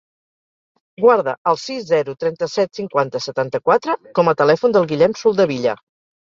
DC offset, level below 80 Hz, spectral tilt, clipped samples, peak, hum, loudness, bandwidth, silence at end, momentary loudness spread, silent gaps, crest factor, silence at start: under 0.1%; -62 dBFS; -5.5 dB/octave; under 0.1%; -2 dBFS; none; -18 LUFS; 7.6 kHz; 0.6 s; 8 LU; 1.38-1.45 s; 16 dB; 1 s